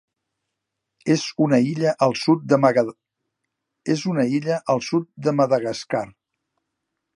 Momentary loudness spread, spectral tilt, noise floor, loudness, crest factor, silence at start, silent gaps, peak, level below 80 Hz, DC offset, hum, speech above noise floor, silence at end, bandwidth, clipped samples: 9 LU; -6 dB/octave; -81 dBFS; -21 LUFS; 20 dB; 1.05 s; none; -2 dBFS; -68 dBFS; under 0.1%; none; 61 dB; 1.05 s; 11.5 kHz; under 0.1%